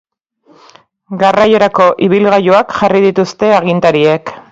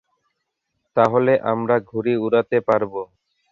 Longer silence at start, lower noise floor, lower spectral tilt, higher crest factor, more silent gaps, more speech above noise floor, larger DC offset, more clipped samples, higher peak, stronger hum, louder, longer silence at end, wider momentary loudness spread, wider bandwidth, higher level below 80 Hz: first, 1.1 s vs 0.95 s; second, -50 dBFS vs -76 dBFS; second, -6.5 dB/octave vs -8.5 dB/octave; second, 10 dB vs 18 dB; neither; second, 40 dB vs 57 dB; neither; first, 0.1% vs under 0.1%; about the same, 0 dBFS vs -2 dBFS; neither; first, -10 LUFS vs -20 LUFS; second, 0.1 s vs 0.45 s; second, 5 LU vs 10 LU; about the same, 7.8 kHz vs 7.2 kHz; first, -50 dBFS vs -62 dBFS